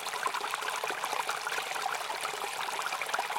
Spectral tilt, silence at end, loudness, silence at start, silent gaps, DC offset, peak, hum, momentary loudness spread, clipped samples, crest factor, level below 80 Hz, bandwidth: 0.5 dB/octave; 0 s; -33 LUFS; 0 s; none; under 0.1%; -14 dBFS; none; 2 LU; under 0.1%; 20 dB; -80 dBFS; 17 kHz